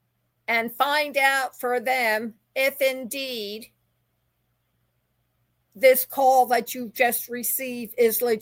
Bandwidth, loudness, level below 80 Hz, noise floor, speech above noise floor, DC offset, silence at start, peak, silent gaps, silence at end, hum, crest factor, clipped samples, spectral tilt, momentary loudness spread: 17 kHz; -23 LUFS; -76 dBFS; -72 dBFS; 49 dB; under 0.1%; 0.5 s; -6 dBFS; none; 0 s; none; 20 dB; under 0.1%; -1.5 dB/octave; 13 LU